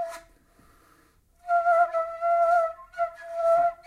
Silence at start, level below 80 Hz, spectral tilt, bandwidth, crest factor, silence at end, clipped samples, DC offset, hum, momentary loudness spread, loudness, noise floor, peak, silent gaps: 0 s; -64 dBFS; -3 dB/octave; 11.5 kHz; 14 dB; 0.1 s; under 0.1%; under 0.1%; none; 12 LU; -25 LUFS; -61 dBFS; -12 dBFS; none